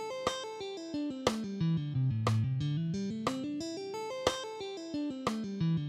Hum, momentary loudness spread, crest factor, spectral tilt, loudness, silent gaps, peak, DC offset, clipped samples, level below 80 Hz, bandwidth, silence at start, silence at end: none; 8 LU; 22 dB; -6 dB/octave; -35 LUFS; none; -12 dBFS; under 0.1%; under 0.1%; -62 dBFS; 14.5 kHz; 0 s; 0 s